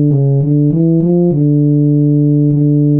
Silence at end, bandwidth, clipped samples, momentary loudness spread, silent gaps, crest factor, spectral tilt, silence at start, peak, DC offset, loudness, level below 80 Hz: 0 s; 1.1 kHz; under 0.1%; 1 LU; none; 6 dB; -16.5 dB/octave; 0 s; -4 dBFS; 0.7%; -11 LUFS; -52 dBFS